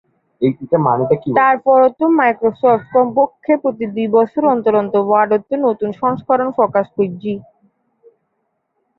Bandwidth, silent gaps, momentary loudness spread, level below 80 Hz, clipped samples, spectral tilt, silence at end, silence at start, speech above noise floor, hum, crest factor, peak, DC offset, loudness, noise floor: 4.2 kHz; none; 7 LU; -60 dBFS; under 0.1%; -10.5 dB/octave; 1.6 s; 0.4 s; 55 dB; none; 14 dB; -2 dBFS; under 0.1%; -15 LUFS; -69 dBFS